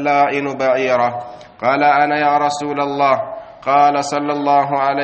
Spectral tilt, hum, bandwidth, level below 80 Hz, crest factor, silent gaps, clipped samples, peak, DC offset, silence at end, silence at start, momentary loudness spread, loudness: -5 dB/octave; none; 8.4 kHz; -60 dBFS; 16 dB; none; under 0.1%; 0 dBFS; under 0.1%; 0 s; 0 s; 7 LU; -16 LUFS